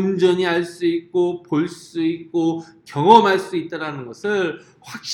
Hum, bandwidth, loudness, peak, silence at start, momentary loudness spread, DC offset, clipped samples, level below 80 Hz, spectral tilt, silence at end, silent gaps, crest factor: none; 12 kHz; -19 LUFS; 0 dBFS; 0 s; 17 LU; under 0.1%; under 0.1%; -64 dBFS; -5.5 dB/octave; 0 s; none; 20 dB